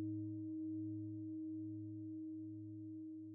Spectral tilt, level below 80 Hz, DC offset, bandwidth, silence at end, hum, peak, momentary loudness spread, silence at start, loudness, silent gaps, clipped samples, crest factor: -17 dB/octave; under -90 dBFS; under 0.1%; 1 kHz; 0 s; none; -36 dBFS; 6 LU; 0 s; -48 LUFS; none; under 0.1%; 10 dB